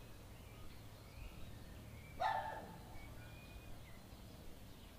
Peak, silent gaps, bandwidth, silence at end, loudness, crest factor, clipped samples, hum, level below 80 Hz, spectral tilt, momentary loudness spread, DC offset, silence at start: -28 dBFS; none; 15.5 kHz; 0 s; -50 LUFS; 22 dB; under 0.1%; none; -58 dBFS; -5 dB/octave; 16 LU; under 0.1%; 0 s